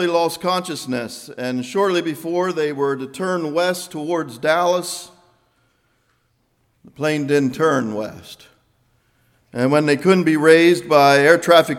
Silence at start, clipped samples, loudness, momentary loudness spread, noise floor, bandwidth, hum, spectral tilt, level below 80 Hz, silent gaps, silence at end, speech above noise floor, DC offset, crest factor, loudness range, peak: 0 s; under 0.1%; -18 LUFS; 14 LU; -65 dBFS; 16.5 kHz; none; -5 dB/octave; -64 dBFS; none; 0 s; 47 dB; under 0.1%; 18 dB; 7 LU; 0 dBFS